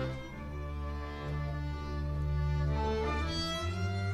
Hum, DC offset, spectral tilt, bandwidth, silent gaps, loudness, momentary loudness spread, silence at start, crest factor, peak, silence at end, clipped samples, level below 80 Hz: none; under 0.1%; -6 dB/octave; 10.5 kHz; none; -35 LUFS; 8 LU; 0 s; 12 dB; -22 dBFS; 0 s; under 0.1%; -40 dBFS